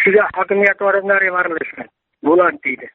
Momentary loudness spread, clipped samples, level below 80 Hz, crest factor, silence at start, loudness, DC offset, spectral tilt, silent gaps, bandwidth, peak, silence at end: 10 LU; under 0.1%; -58 dBFS; 16 dB; 0 s; -15 LUFS; under 0.1%; -4 dB/octave; none; 4.1 kHz; 0 dBFS; 0.05 s